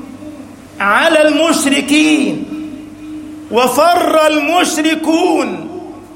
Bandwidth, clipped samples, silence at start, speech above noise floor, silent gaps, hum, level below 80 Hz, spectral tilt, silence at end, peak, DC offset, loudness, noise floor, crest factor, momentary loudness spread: 16.5 kHz; under 0.1%; 0 s; 21 dB; none; none; -52 dBFS; -3 dB/octave; 0 s; 0 dBFS; under 0.1%; -12 LUFS; -32 dBFS; 14 dB; 19 LU